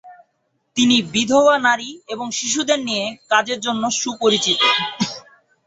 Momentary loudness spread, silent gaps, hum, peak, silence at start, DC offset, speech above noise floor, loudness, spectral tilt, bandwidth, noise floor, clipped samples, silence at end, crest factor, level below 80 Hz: 11 LU; none; none; -2 dBFS; 0.05 s; under 0.1%; 51 dB; -18 LUFS; -2 dB/octave; 8.2 kHz; -69 dBFS; under 0.1%; 0.45 s; 18 dB; -62 dBFS